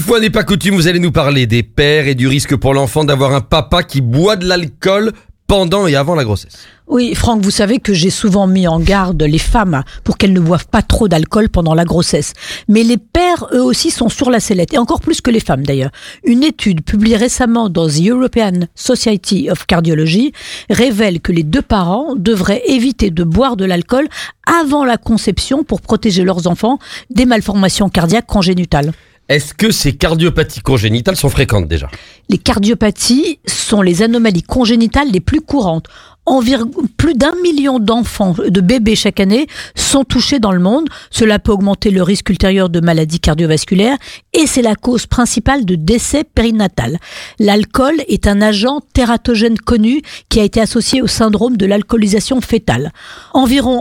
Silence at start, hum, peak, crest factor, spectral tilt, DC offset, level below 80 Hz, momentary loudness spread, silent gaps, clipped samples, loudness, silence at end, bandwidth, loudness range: 0 s; none; 0 dBFS; 12 dB; -5 dB/octave; under 0.1%; -26 dBFS; 5 LU; none; under 0.1%; -12 LUFS; 0 s; 16.5 kHz; 1 LU